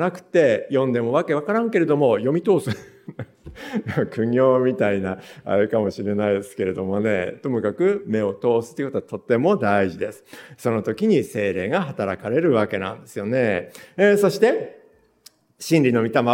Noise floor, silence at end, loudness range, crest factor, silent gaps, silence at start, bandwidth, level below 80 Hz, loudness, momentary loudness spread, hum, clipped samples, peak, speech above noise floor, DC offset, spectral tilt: -54 dBFS; 0 s; 2 LU; 18 dB; none; 0 s; 17 kHz; -62 dBFS; -21 LUFS; 12 LU; none; under 0.1%; -4 dBFS; 33 dB; under 0.1%; -7 dB/octave